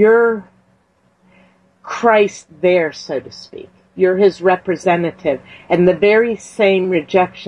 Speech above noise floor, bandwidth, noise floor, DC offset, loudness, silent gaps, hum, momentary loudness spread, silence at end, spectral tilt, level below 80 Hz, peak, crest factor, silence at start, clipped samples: 43 dB; 10.5 kHz; -58 dBFS; under 0.1%; -15 LUFS; none; none; 14 LU; 0 s; -6 dB/octave; -56 dBFS; -2 dBFS; 14 dB; 0 s; under 0.1%